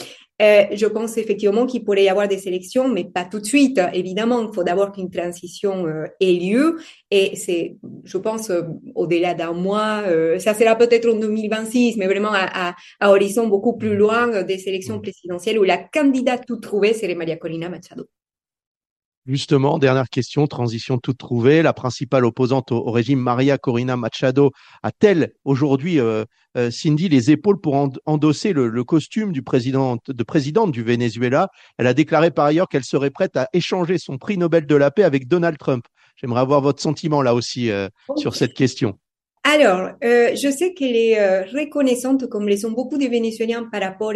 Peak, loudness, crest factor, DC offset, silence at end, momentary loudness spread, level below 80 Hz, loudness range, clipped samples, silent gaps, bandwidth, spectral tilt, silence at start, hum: 0 dBFS; -19 LUFS; 18 dB; under 0.1%; 0 s; 10 LU; -62 dBFS; 3 LU; under 0.1%; 18.67-18.80 s, 18.91-19.22 s; 12.5 kHz; -6 dB/octave; 0 s; none